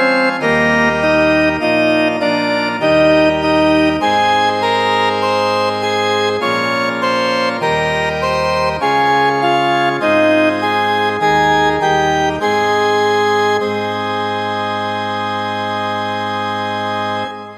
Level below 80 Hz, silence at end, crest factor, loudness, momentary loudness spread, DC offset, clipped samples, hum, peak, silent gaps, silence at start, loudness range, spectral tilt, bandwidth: -42 dBFS; 0 s; 14 dB; -14 LUFS; 7 LU; under 0.1%; under 0.1%; none; -2 dBFS; none; 0 s; 4 LU; -4.5 dB/octave; 14 kHz